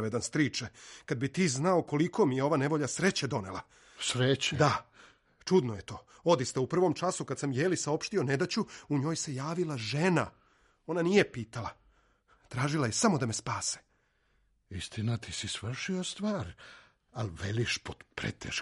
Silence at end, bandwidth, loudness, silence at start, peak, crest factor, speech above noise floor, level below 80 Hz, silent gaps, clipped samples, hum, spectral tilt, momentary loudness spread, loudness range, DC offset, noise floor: 0 s; 11.5 kHz; -31 LUFS; 0 s; -12 dBFS; 20 dB; 41 dB; -62 dBFS; none; under 0.1%; none; -4.5 dB/octave; 14 LU; 6 LU; under 0.1%; -72 dBFS